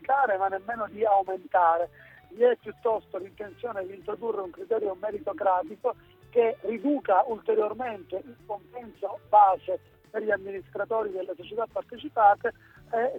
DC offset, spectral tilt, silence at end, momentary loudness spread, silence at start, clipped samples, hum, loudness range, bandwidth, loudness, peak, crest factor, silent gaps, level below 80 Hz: under 0.1%; -7 dB/octave; 0 s; 15 LU; 0 s; under 0.1%; none; 4 LU; 4.1 kHz; -27 LUFS; -8 dBFS; 20 dB; none; -66 dBFS